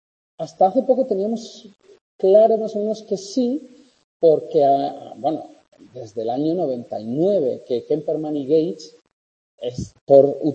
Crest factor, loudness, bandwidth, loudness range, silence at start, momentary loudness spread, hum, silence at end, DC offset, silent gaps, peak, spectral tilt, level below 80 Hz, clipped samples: 20 dB; -20 LUFS; 8.6 kHz; 4 LU; 0.4 s; 16 LU; none; 0 s; under 0.1%; 2.01-2.19 s, 4.04-4.20 s, 9.13-9.58 s, 10.01-10.07 s; 0 dBFS; -7.5 dB/octave; -60 dBFS; under 0.1%